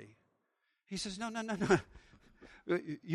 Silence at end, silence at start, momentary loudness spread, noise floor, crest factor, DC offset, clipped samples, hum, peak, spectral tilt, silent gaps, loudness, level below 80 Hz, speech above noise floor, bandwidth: 0 s; 0 s; 11 LU; -82 dBFS; 24 dB; under 0.1%; under 0.1%; none; -14 dBFS; -5 dB/octave; none; -36 LUFS; -64 dBFS; 46 dB; 12 kHz